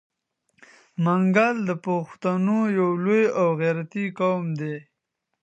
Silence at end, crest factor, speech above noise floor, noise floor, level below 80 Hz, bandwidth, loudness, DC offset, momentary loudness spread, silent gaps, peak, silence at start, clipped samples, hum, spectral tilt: 0.6 s; 18 dB; 58 dB; -80 dBFS; -76 dBFS; 8.2 kHz; -23 LUFS; under 0.1%; 10 LU; none; -6 dBFS; 1 s; under 0.1%; none; -8 dB/octave